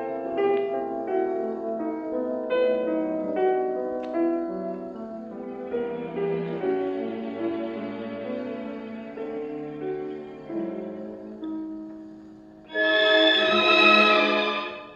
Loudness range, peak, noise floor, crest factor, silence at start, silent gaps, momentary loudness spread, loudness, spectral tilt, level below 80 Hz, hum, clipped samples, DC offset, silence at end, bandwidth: 14 LU; -4 dBFS; -46 dBFS; 22 dB; 0 s; none; 19 LU; -24 LUFS; -5 dB/octave; -66 dBFS; none; under 0.1%; under 0.1%; 0 s; 8.2 kHz